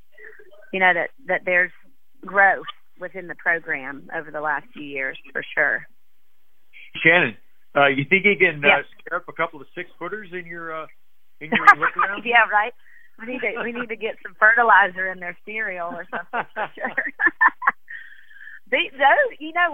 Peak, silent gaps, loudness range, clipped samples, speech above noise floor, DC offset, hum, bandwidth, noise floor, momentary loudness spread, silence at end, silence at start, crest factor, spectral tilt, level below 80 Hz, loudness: 0 dBFS; none; 6 LU; under 0.1%; 50 dB; 0.8%; none; 16 kHz; -71 dBFS; 17 LU; 0 s; 0.2 s; 22 dB; -5.5 dB/octave; -68 dBFS; -20 LUFS